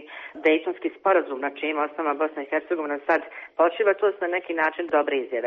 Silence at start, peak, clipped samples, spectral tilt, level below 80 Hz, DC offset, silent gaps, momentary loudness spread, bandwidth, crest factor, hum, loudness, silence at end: 0 s; -8 dBFS; under 0.1%; -0.5 dB/octave; -74 dBFS; under 0.1%; none; 6 LU; 6.4 kHz; 16 dB; none; -24 LUFS; 0 s